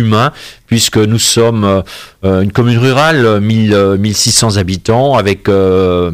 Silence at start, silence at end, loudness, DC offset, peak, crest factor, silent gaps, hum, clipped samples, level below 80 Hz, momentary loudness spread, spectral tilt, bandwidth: 0 s; 0 s; -10 LUFS; under 0.1%; 0 dBFS; 10 dB; none; none; under 0.1%; -38 dBFS; 6 LU; -4.5 dB/octave; 16 kHz